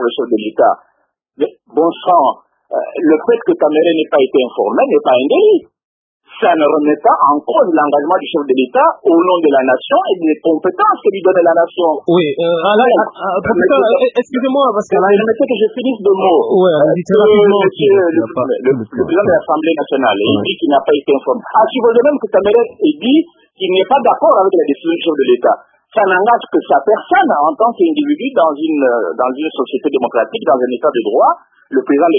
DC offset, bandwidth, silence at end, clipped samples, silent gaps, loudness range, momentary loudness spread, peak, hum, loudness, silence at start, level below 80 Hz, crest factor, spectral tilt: under 0.1%; 7.4 kHz; 0 s; under 0.1%; 5.84-6.20 s; 3 LU; 6 LU; 0 dBFS; none; -12 LUFS; 0 s; -56 dBFS; 12 dB; -7.5 dB/octave